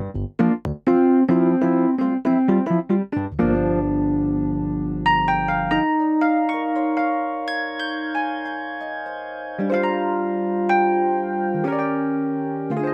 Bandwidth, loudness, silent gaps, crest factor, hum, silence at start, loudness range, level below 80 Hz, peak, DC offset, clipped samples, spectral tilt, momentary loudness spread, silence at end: 6.8 kHz; -21 LUFS; none; 14 dB; none; 0 s; 6 LU; -42 dBFS; -6 dBFS; under 0.1%; under 0.1%; -8.5 dB/octave; 8 LU; 0 s